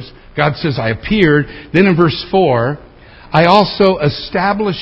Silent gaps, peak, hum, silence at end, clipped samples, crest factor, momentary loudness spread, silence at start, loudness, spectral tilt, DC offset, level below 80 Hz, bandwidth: none; 0 dBFS; none; 0 s; 0.1%; 14 dB; 7 LU; 0 s; -13 LUFS; -8 dB/octave; under 0.1%; -38 dBFS; 8 kHz